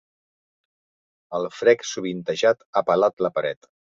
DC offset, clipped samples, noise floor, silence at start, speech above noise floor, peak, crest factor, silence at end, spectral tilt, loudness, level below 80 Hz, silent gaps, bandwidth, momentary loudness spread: under 0.1%; under 0.1%; under -90 dBFS; 1.3 s; over 68 dB; -4 dBFS; 20 dB; 0.45 s; -4 dB/octave; -23 LUFS; -70 dBFS; 2.66-2.73 s, 3.13-3.17 s; 7.8 kHz; 10 LU